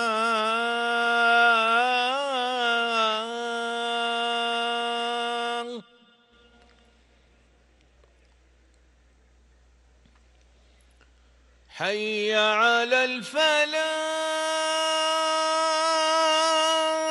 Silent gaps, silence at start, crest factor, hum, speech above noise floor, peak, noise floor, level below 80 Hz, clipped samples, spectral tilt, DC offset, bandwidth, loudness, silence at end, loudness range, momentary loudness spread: none; 0 s; 16 dB; none; 36 dB; -10 dBFS; -60 dBFS; -64 dBFS; under 0.1%; -1 dB/octave; under 0.1%; 12 kHz; -23 LUFS; 0 s; 11 LU; 8 LU